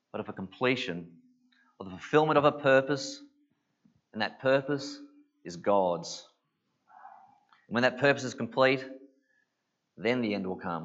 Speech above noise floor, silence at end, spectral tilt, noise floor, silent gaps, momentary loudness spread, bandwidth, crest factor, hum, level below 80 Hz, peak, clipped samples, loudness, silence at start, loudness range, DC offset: 53 dB; 0 s; -5 dB/octave; -81 dBFS; none; 20 LU; 8 kHz; 22 dB; none; -78 dBFS; -8 dBFS; under 0.1%; -28 LUFS; 0.15 s; 4 LU; under 0.1%